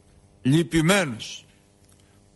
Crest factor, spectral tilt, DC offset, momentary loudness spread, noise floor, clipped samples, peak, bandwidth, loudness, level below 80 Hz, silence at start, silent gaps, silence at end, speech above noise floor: 18 dB; -5 dB/octave; under 0.1%; 16 LU; -56 dBFS; under 0.1%; -8 dBFS; 12 kHz; -22 LUFS; -50 dBFS; 0.45 s; none; 0.95 s; 35 dB